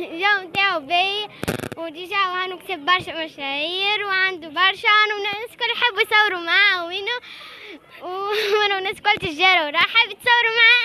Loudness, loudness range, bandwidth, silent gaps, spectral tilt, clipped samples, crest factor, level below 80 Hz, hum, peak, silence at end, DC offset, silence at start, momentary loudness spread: -19 LUFS; 4 LU; 13.5 kHz; none; -2.5 dB/octave; under 0.1%; 18 dB; -58 dBFS; none; -2 dBFS; 0 s; under 0.1%; 0 s; 13 LU